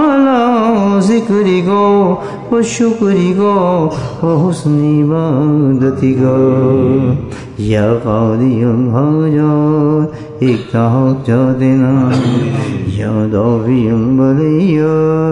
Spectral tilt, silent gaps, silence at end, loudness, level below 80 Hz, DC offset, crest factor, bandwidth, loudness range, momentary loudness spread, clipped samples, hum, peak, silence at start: -8 dB/octave; none; 0 s; -12 LUFS; -42 dBFS; under 0.1%; 10 dB; 10.5 kHz; 1 LU; 5 LU; under 0.1%; none; 0 dBFS; 0 s